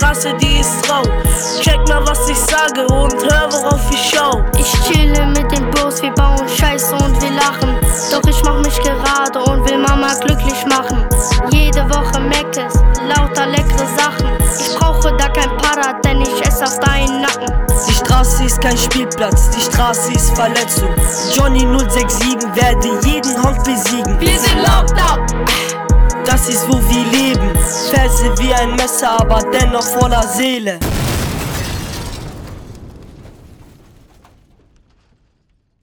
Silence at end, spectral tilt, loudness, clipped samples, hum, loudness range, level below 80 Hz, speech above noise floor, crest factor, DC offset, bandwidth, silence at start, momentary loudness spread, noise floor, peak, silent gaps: 2.3 s; -4 dB/octave; -13 LUFS; under 0.1%; none; 2 LU; -16 dBFS; 48 dB; 12 dB; under 0.1%; over 20 kHz; 0 s; 3 LU; -60 dBFS; 0 dBFS; none